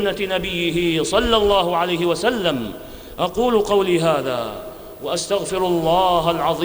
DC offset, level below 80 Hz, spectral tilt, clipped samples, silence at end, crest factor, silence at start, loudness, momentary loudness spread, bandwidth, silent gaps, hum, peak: under 0.1%; -40 dBFS; -4.5 dB/octave; under 0.1%; 0 s; 16 dB; 0 s; -19 LUFS; 12 LU; over 20 kHz; none; none; -4 dBFS